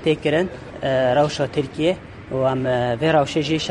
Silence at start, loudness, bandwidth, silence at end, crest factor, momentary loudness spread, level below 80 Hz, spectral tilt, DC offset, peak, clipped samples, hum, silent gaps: 0 s; -21 LUFS; 11 kHz; 0 s; 16 dB; 8 LU; -48 dBFS; -6 dB/octave; under 0.1%; -4 dBFS; under 0.1%; none; none